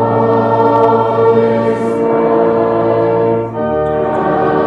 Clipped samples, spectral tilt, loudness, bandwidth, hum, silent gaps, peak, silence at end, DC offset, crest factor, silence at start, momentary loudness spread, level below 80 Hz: under 0.1%; -9 dB/octave; -12 LUFS; 5.8 kHz; none; none; 0 dBFS; 0 s; under 0.1%; 12 dB; 0 s; 4 LU; -44 dBFS